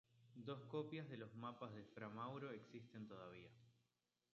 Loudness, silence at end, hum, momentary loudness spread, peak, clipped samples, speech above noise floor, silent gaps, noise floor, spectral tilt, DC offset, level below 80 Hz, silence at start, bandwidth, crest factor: -54 LUFS; 0.6 s; none; 10 LU; -36 dBFS; under 0.1%; 36 dB; none; -90 dBFS; -5.5 dB/octave; under 0.1%; -88 dBFS; 0.1 s; 7.2 kHz; 20 dB